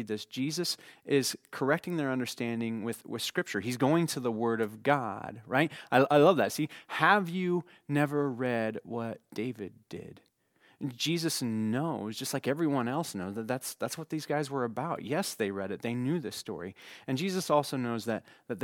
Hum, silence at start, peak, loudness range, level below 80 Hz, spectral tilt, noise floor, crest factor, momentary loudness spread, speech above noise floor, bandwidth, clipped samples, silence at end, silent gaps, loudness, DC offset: none; 0 s; -8 dBFS; 7 LU; -78 dBFS; -5 dB/octave; -66 dBFS; 24 dB; 11 LU; 35 dB; 18.5 kHz; under 0.1%; 0 s; none; -31 LUFS; under 0.1%